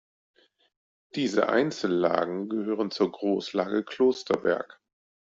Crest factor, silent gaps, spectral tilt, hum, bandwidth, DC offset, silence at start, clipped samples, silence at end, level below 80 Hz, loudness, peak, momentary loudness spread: 20 dB; none; -5.5 dB/octave; none; 7.8 kHz; under 0.1%; 1.15 s; under 0.1%; 0.65 s; -70 dBFS; -27 LUFS; -8 dBFS; 7 LU